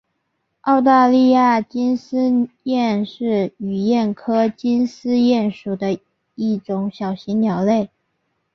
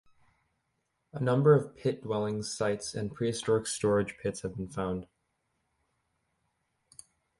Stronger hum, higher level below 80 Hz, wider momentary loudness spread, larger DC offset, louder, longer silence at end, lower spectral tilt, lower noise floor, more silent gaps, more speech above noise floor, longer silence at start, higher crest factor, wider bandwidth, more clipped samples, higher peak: neither; about the same, -62 dBFS vs -60 dBFS; about the same, 11 LU vs 12 LU; neither; first, -18 LUFS vs -30 LUFS; second, 0.7 s vs 2.35 s; first, -7.5 dB/octave vs -5.5 dB/octave; second, -72 dBFS vs -79 dBFS; neither; first, 55 dB vs 50 dB; second, 0.65 s vs 1.15 s; second, 16 dB vs 22 dB; second, 6.4 kHz vs 11.5 kHz; neither; first, -2 dBFS vs -12 dBFS